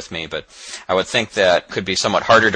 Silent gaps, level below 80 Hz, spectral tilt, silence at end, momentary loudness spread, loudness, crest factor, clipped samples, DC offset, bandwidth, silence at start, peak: none; -52 dBFS; -3 dB/octave; 0 s; 15 LU; -18 LUFS; 18 dB; under 0.1%; under 0.1%; 10 kHz; 0 s; 0 dBFS